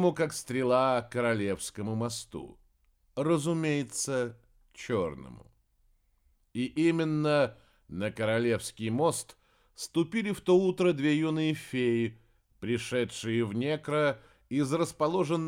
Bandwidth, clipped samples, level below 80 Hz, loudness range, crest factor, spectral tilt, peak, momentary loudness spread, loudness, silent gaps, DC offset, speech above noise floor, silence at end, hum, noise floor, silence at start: 16 kHz; under 0.1%; -64 dBFS; 4 LU; 18 dB; -5.5 dB/octave; -12 dBFS; 12 LU; -30 LUFS; none; under 0.1%; 40 dB; 0 s; none; -69 dBFS; 0 s